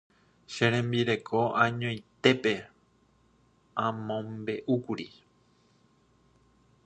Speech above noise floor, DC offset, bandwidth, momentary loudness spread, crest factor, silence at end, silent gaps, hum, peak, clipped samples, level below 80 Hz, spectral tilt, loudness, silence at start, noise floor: 37 dB; under 0.1%; 8.8 kHz; 12 LU; 24 dB; 1.8 s; none; none; -6 dBFS; under 0.1%; -66 dBFS; -6 dB/octave; -29 LUFS; 0.5 s; -66 dBFS